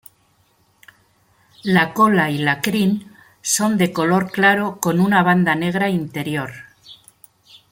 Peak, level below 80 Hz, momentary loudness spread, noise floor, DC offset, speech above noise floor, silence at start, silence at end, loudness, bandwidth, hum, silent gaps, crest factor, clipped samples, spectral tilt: -2 dBFS; -58 dBFS; 11 LU; -60 dBFS; under 0.1%; 42 dB; 1.65 s; 0.8 s; -18 LUFS; 17 kHz; none; none; 18 dB; under 0.1%; -4.5 dB/octave